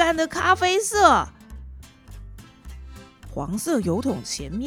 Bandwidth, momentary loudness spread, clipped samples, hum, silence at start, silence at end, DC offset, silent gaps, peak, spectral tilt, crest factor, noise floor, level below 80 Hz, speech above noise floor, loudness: 18.5 kHz; 26 LU; under 0.1%; none; 0 s; 0 s; under 0.1%; none; -2 dBFS; -3.5 dB/octave; 22 dB; -42 dBFS; -42 dBFS; 21 dB; -21 LUFS